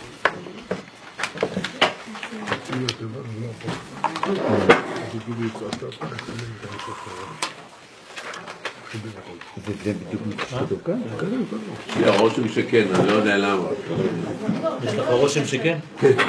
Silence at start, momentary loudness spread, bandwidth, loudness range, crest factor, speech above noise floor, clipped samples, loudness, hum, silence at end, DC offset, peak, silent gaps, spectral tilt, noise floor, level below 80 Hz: 0 s; 15 LU; 11 kHz; 12 LU; 24 dB; 21 dB; under 0.1%; -24 LUFS; none; 0 s; under 0.1%; 0 dBFS; none; -5 dB/octave; -44 dBFS; -60 dBFS